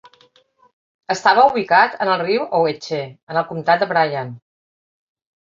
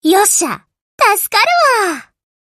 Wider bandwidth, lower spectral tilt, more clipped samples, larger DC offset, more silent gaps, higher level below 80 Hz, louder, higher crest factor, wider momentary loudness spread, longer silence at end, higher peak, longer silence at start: second, 7.6 kHz vs 15 kHz; first, -4.5 dB/octave vs -0.5 dB/octave; neither; neither; second, 3.23-3.27 s vs 0.81-0.98 s; about the same, -66 dBFS vs -62 dBFS; second, -17 LUFS vs -12 LUFS; about the same, 18 dB vs 14 dB; about the same, 13 LU vs 12 LU; first, 1.05 s vs 0.5 s; about the same, 0 dBFS vs 0 dBFS; first, 1.1 s vs 0.05 s